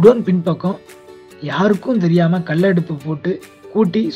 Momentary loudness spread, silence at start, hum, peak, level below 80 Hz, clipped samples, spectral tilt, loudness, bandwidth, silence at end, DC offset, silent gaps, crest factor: 10 LU; 0 s; none; 0 dBFS; -56 dBFS; under 0.1%; -8.5 dB/octave; -17 LUFS; 11.5 kHz; 0 s; under 0.1%; none; 16 dB